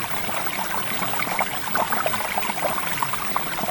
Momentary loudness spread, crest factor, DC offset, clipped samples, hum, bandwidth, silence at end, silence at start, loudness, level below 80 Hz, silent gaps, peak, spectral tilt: 2 LU; 18 dB; under 0.1%; under 0.1%; none; 19 kHz; 0 s; 0 s; -22 LUFS; -54 dBFS; none; -6 dBFS; -2.5 dB/octave